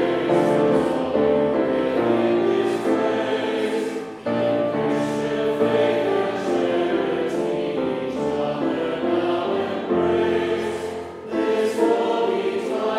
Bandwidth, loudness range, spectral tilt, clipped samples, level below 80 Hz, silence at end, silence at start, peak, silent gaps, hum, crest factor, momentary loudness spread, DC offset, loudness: 13 kHz; 3 LU; -6 dB/octave; under 0.1%; -58 dBFS; 0 s; 0 s; -6 dBFS; none; none; 14 dB; 5 LU; under 0.1%; -22 LUFS